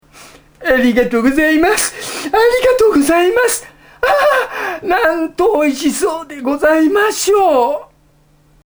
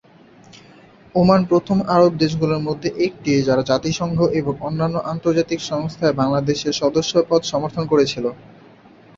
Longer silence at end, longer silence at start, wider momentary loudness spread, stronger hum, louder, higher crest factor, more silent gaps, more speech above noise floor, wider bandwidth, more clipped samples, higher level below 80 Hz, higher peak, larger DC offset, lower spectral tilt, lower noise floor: first, 0.8 s vs 0.65 s; second, 0.2 s vs 0.55 s; about the same, 9 LU vs 8 LU; neither; first, -13 LUFS vs -19 LUFS; about the same, 14 dB vs 18 dB; neither; first, 38 dB vs 29 dB; first, over 20 kHz vs 7.8 kHz; neither; first, -42 dBFS vs -48 dBFS; about the same, 0 dBFS vs -2 dBFS; neither; second, -3 dB/octave vs -6 dB/octave; first, -51 dBFS vs -47 dBFS